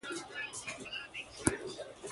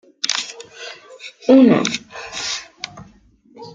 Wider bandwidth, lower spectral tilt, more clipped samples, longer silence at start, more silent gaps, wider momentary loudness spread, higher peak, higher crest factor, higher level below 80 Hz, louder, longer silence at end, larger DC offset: first, 12 kHz vs 9.2 kHz; about the same, -3 dB/octave vs -4 dB/octave; neither; second, 0.05 s vs 0.25 s; neither; second, 10 LU vs 23 LU; second, -8 dBFS vs -2 dBFS; first, 32 dB vs 18 dB; about the same, -58 dBFS vs -60 dBFS; second, -39 LUFS vs -17 LUFS; about the same, 0 s vs 0.05 s; neither